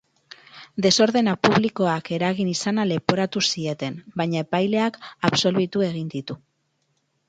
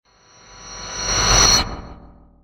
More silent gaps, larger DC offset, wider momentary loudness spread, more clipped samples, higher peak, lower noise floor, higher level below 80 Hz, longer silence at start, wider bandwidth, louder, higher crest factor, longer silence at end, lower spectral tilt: neither; neither; second, 12 LU vs 23 LU; neither; about the same, 0 dBFS vs -2 dBFS; first, -71 dBFS vs -49 dBFS; second, -62 dBFS vs -30 dBFS; about the same, 0.55 s vs 0.55 s; second, 9.2 kHz vs 16.5 kHz; second, -22 LUFS vs -15 LUFS; about the same, 22 dB vs 20 dB; first, 0.9 s vs 0.35 s; first, -4.5 dB/octave vs -1 dB/octave